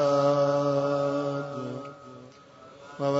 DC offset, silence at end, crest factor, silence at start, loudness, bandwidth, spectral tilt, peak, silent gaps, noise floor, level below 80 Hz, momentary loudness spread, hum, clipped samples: under 0.1%; 0 s; 16 dB; 0 s; -27 LUFS; 8 kHz; -7 dB/octave; -12 dBFS; none; -50 dBFS; -72 dBFS; 24 LU; none; under 0.1%